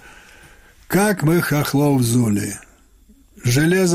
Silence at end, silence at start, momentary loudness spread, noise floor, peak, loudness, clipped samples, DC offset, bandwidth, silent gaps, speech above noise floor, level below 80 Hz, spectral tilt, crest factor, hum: 0 s; 0.9 s; 8 LU; -51 dBFS; -4 dBFS; -18 LUFS; under 0.1%; under 0.1%; 16 kHz; none; 34 dB; -48 dBFS; -5.5 dB/octave; 14 dB; none